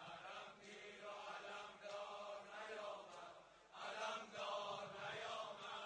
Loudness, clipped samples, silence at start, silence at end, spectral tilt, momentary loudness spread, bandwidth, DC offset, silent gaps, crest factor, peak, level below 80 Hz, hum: -51 LUFS; under 0.1%; 0 s; 0 s; -2 dB/octave; 10 LU; 10 kHz; under 0.1%; none; 16 dB; -34 dBFS; -88 dBFS; none